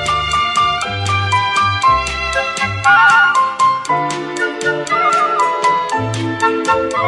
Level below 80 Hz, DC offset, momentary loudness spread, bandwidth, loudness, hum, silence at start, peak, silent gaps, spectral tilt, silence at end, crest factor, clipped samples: -40 dBFS; under 0.1%; 8 LU; 11.5 kHz; -14 LUFS; none; 0 s; 0 dBFS; none; -3.5 dB/octave; 0 s; 14 dB; under 0.1%